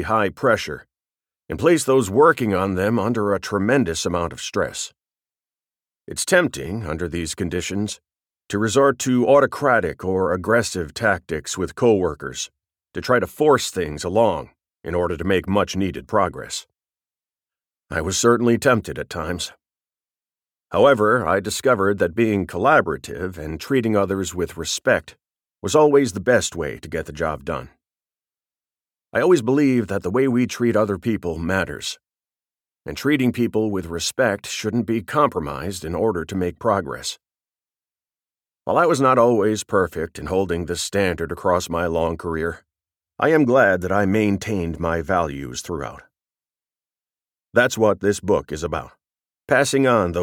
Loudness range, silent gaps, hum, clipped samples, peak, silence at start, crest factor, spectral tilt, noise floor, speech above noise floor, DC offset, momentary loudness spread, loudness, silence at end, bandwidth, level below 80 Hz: 5 LU; none; none; under 0.1%; -4 dBFS; 0 s; 18 dB; -5 dB/octave; under -90 dBFS; over 70 dB; under 0.1%; 13 LU; -20 LUFS; 0 s; 17.5 kHz; -46 dBFS